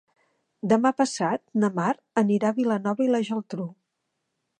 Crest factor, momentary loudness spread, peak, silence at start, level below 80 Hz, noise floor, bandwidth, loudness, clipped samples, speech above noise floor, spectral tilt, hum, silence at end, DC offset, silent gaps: 18 dB; 11 LU; -6 dBFS; 0.65 s; -74 dBFS; -79 dBFS; 9.6 kHz; -25 LUFS; under 0.1%; 55 dB; -6 dB/octave; none; 0.85 s; under 0.1%; none